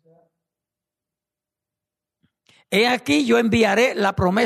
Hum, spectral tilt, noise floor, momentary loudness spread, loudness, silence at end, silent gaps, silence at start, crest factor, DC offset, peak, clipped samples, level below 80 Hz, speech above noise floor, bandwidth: none; -5 dB/octave; -88 dBFS; 3 LU; -18 LUFS; 0 s; none; 2.7 s; 16 dB; under 0.1%; -6 dBFS; under 0.1%; -50 dBFS; 70 dB; 13.5 kHz